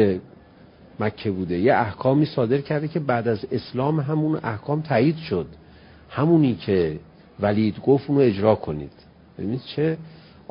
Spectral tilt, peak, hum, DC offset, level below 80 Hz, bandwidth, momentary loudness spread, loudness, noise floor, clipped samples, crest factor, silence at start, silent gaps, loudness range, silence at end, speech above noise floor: -12 dB/octave; -4 dBFS; none; under 0.1%; -50 dBFS; 5.4 kHz; 11 LU; -23 LUFS; -49 dBFS; under 0.1%; 18 dB; 0 s; none; 2 LU; 0.35 s; 27 dB